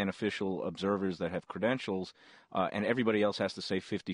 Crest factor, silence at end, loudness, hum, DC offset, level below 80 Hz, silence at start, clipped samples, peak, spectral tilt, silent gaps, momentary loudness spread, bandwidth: 18 dB; 0 s; -33 LUFS; none; under 0.1%; -70 dBFS; 0 s; under 0.1%; -14 dBFS; -6 dB/octave; none; 8 LU; 10.5 kHz